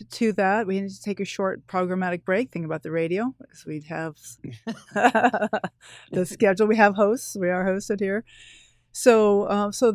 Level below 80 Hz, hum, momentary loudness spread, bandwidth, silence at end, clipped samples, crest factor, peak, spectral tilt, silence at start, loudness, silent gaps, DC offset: -64 dBFS; none; 17 LU; 16 kHz; 0 s; under 0.1%; 22 dB; -2 dBFS; -5.5 dB/octave; 0 s; -23 LUFS; none; under 0.1%